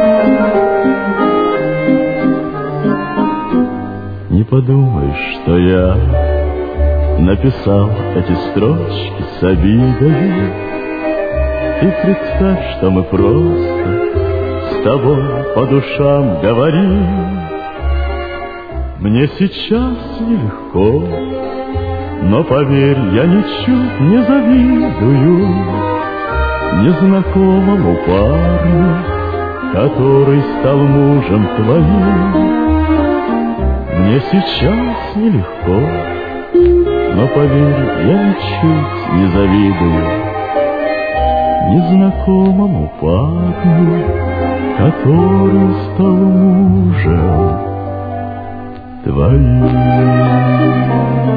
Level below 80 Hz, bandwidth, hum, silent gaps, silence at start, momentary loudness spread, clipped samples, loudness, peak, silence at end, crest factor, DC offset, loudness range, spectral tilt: -24 dBFS; 5 kHz; none; none; 0 s; 9 LU; under 0.1%; -12 LUFS; 0 dBFS; 0 s; 12 dB; under 0.1%; 4 LU; -11 dB/octave